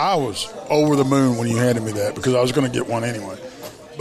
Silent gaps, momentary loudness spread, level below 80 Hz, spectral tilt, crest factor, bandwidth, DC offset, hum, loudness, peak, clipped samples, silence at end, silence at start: none; 17 LU; -56 dBFS; -5.5 dB/octave; 16 dB; 14.5 kHz; under 0.1%; none; -20 LUFS; -4 dBFS; under 0.1%; 0 s; 0 s